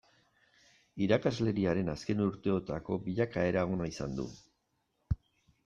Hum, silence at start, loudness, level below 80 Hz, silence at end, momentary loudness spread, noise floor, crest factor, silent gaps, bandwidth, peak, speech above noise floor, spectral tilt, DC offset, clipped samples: none; 0.95 s; -33 LUFS; -52 dBFS; 0.5 s; 10 LU; -79 dBFS; 20 dB; none; 9.2 kHz; -14 dBFS; 47 dB; -7 dB/octave; under 0.1%; under 0.1%